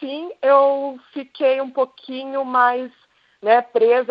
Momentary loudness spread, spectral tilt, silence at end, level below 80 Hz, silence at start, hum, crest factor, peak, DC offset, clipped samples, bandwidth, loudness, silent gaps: 15 LU; -6 dB/octave; 0.05 s; -80 dBFS; 0 s; none; 18 dB; -2 dBFS; under 0.1%; under 0.1%; 5.2 kHz; -19 LUFS; none